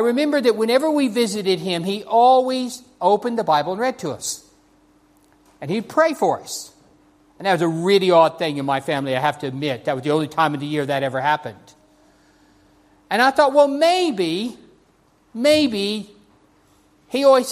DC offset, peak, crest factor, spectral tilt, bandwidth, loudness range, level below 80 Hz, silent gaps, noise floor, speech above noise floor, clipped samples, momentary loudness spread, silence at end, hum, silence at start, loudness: under 0.1%; -2 dBFS; 18 dB; -4.5 dB/octave; 15.5 kHz; 5 LU; -64 dBFS; none; -58 dBFS; 39 dB; under 0.1%; 12 LU; 0 s; none; 0 s; -19 LUFS